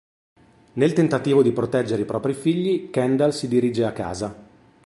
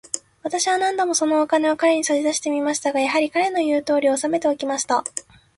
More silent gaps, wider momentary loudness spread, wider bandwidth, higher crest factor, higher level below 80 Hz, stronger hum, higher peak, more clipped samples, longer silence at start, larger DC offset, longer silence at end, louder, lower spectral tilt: neither; first, 10 LU vs 5 LU; about the same, 11.5 kHz vs 12 kHz; about the same, 16 dB vs 16 dB; first, -56 dBFS vs -66 dBFS; neither; about the same, -6 dBFS vs -4 dBFS; neither; first, 0.75 s vs 0.15 s; neither; about the same, 0.4 s vs 0.35 s; about the same, -22 LUFS vs -20 LUFS; first, -7 dB/octave vs -2 dB/octave